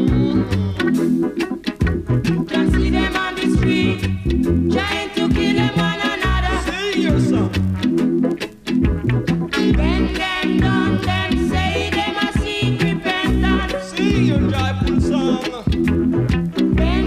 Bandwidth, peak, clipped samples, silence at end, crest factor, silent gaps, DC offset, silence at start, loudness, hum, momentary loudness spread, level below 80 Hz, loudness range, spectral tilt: 14.5 kHz; -4 dBFS; under 0.1%; 0 s; 14 dB; none; under 0.1%; 0 s; -18 LUFS; none; 4 LU; -26 dBFS; 1 LU; -6.5 dB/octave